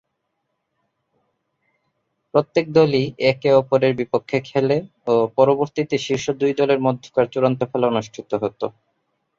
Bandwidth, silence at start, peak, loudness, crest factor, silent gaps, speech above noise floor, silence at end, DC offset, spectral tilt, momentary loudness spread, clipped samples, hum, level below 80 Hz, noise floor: 7.6 kHz; 2.35 s; -2 dBFS; -20 LUFS; 18 dB; none; 56 dB; 0.7 s; under 0.1%; -6.5 dB/octave; 8 LU; under 0.1%; none; -60 dBFS; -75 dBFS